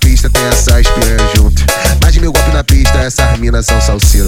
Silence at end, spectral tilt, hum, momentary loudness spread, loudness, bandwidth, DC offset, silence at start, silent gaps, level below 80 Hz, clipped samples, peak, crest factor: 0 s; -4 dB/octave; none; 2 LU; -10 LUFS; 18 kHz; under 0.1%; 0 s; none; -10 dBFS; under 0.1%; 0 dBFS; 8 dB